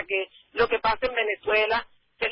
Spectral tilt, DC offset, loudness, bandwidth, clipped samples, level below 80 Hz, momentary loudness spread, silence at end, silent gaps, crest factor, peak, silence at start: -7.5 dB/octave; under 0.1%; -25 LUFS; 5.6 kHz; under 0.1%; -52 dBFS; 7 LU; 0 s; none; 16 dB; -10 dBFS; 0 s